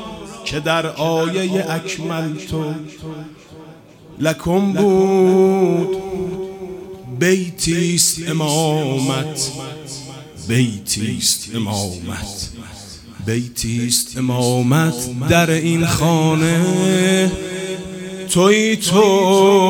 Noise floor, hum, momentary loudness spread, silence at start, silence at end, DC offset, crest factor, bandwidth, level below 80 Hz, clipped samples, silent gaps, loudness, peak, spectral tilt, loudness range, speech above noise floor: -41 dBFS; none; 17 LU; 0 s; 0 s; under 0.1%; 18 dB; 20 kHz; -44 dBFS; under 0.1%; none; -17 LUFS; 0 dBFS; -4.5 dB/octave; 6 LU; 24 dB